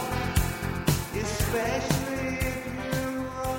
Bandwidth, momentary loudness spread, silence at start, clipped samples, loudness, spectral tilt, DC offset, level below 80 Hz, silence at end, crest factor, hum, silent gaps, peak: 19 kHz; 4 LU; 0 s; under 0.1%; -29 LUFS; -5 dB/octave; under 0.1%; -38 dBFS; 0 s; 20 dB; none; none; -8 dBFS